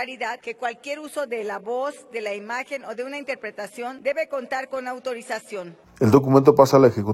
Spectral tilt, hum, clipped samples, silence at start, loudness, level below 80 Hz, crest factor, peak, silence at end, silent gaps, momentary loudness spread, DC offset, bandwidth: -6.5 dB/octave; none; under 0.1%; 0 s; -23 LUFS; -60 dBFS; 22 dB; -2 dBFS; 0 s; none; 17 LU; under 0.1%; 16.5 kHz